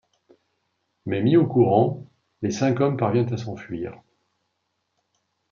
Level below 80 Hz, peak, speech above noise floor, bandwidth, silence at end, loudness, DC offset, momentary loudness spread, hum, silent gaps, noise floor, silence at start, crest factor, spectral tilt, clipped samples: -66 dBFS; -4 dBFS; 54 dB; 7.4 kHz; 1.55 s; -22 LUFS; under 0.1%; 15 LU; none; none; -76 dBFS; 1.05 s; 20 dB; -7.5 dB/octave; under 0.1%